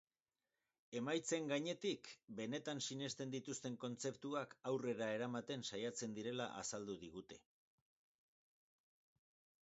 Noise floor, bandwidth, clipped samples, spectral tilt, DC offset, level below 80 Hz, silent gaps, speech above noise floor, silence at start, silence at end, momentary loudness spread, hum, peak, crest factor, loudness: under -90 dBFS; 8 kHz; under 0.1%; -4 dB/octave; under 0.1%; -84 dBFS; 2.24-2.28 s; over 45 dB; 0.9 s; 2.25 s; 9 LU; none; -28 dBFS; 18 dB; -45 LUFS